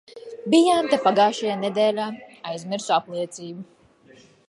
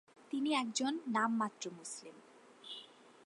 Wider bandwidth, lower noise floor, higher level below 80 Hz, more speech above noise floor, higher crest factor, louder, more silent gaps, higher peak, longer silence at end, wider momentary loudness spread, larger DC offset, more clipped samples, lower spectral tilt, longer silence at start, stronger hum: about the same, 11.5 kHz vs 11.5 kHz; second, -53 dBFS vs -57 dBFS; first, -72 dBFS vs under -90 dBFS; first, 31 dB vs 20 dB; about the same, 20 dB vs 20 dB; first, -22 LUFS vs -37 LUFS; neither; first, -4 dBFS vs -20 dBFS; first, 0.85 s vs 0.15 s; about the same, 18 LU vs 18 LU; neither; neither; first, -4.5 dB/octave vs -3 dB/octave; about the same, 0.15 s vs 0.2 s; neither